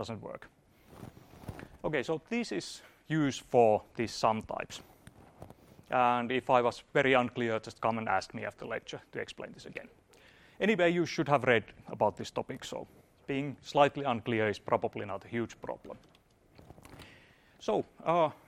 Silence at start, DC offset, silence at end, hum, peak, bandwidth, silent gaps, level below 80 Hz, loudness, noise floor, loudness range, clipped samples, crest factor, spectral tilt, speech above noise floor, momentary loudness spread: 0 s; under 0.1%; 0.15 s; none; -10 dBFS; 15 kHz; none; -64 dBFS; -32 LUFS; -62 dBFS; 6 LU; under 0.1%; 24 dB; -5.5 dB/octave; 30 dB; 20 LU